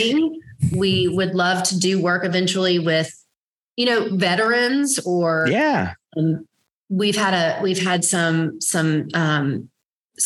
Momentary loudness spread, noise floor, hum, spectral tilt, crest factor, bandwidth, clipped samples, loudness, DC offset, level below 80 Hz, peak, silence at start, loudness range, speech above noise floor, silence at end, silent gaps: 6 LU; -79 dBFS; none; -4 dB/octave; 16 dB; 13 kHz; under 0.1%; -20 LUFS; under 0.1%; -56 dBFS; -4 dBFS; 0 s; 1 LU; 60 dB; 0 s; 3.37-3.76 s, 6.72-6.84 s, 9.93-10.09 s